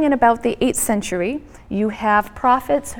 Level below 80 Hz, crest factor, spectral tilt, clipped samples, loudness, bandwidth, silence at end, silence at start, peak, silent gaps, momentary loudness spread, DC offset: -44 dBFS; 16 dB; -4 dB/octave; under 0.1%; -19 LUFS; 18.5 kHz; 0 s; 0 s; -2 dBFS; none; 8 LU; under 0.1%